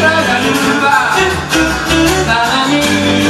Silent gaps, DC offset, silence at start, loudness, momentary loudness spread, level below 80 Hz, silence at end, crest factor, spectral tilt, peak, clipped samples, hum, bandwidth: none; under 0.1%; 0 s; -11 LUFS; 2 LU; -30 dBFS; 0 s; 12 dB; -3.5 dB/octave; 0 dBFS; under 0.1%; none; 14 kHz